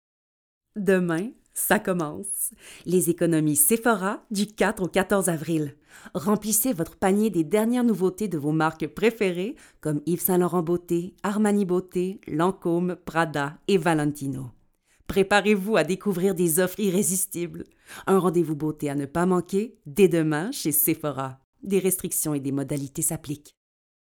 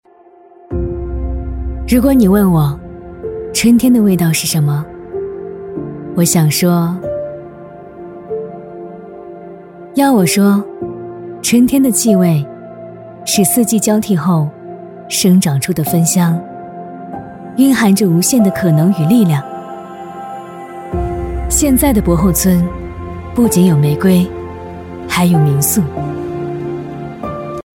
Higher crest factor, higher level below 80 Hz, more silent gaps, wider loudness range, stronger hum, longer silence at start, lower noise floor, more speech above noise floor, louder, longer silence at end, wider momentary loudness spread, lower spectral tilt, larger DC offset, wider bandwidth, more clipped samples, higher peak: first, 20 dB vs 14 dB; second, -56 dBFS vs -30 dBFS; first, 21.44-21.53 s vs none; about the same, 2 LU vs 4 LU; neither; about the same, 0.75 s vs 0.7 s; first, -63 dBFS vs -43 dBFS; first, 38 dB vs 32 dB; second, -24 LUFS vs -13 LUFS; first, 0.65 s vs 0.15 s; second, 10 LU vs 19 LU; about the same, -5 dB/octave vs -5.5 dB/octave; neither; first, over 20 kHz vs 17.5 kHz; neither; second, -6 dBFS vs 0 dBFS